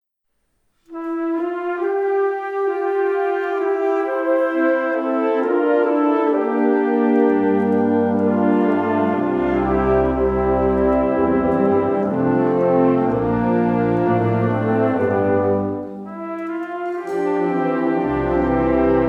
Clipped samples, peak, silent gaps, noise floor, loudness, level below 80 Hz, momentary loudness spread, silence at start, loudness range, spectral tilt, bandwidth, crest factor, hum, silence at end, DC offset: under 0.1%; -4 dBFS; none; -70 dBFS; -19 LUFS; -40 dBFS; 6 LU; 0.9 s; 4 LU; -9.5 dB/octave; 5.8 kHz; 14 dB; none; 0 s; under 0.1%